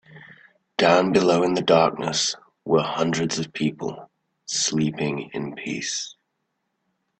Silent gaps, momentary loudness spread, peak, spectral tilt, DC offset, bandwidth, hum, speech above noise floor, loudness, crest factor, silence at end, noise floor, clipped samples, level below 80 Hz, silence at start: none; 14 LU; -4 dBFS; -4 dB/octave; under 0.1%; 9.2 kHz; none; 54 dB; -22 LUFS; 20 dB; 1.1 s; -76 dBFS; under 0.1%; -62 dBFS; 0.1 s